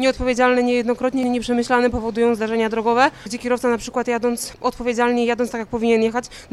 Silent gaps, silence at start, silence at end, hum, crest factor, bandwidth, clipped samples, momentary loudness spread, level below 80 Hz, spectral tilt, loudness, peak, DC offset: none; 0 s; 0.05 s; none; 18 dB; 14 kHz; under 0.1%; 6 LU; -42 dBFS; -4.5 dB/octave; -20 LUFS; -2 dBFS; under 0.1%